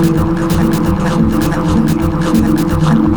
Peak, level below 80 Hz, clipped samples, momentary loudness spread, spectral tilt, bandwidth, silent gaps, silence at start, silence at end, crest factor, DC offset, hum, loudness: 0 dBFS; -24 dBFS; under 0.1%; 2 LU; -7 dB/octave; over 20 kHz; none; 0 s; 0 s; 10 dB; 0.2%; none; -13 LUFS